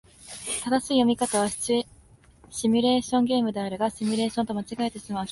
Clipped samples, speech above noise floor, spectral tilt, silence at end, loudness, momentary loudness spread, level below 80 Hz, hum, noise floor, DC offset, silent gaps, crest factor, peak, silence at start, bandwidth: under 0.1%; 29 dB; -4 dB/octave; 0 s; -25 LUFS; 9 LU; -58 dBFS; none; -54 dBFS; under 0.1%; none; 16 dB; -10 dBFS; 0.2 s; 11.5 kHz